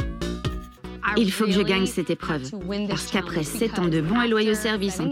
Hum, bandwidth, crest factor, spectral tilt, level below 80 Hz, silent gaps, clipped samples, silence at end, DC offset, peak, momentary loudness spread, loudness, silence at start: none; 16.5 kHz; 16 dB; -5 dB/octave; -40 dBFS; none; under 0.1%; 0 s; under 0.1%; -8 dBFS; 9 LU; -24 LUFS; 0 s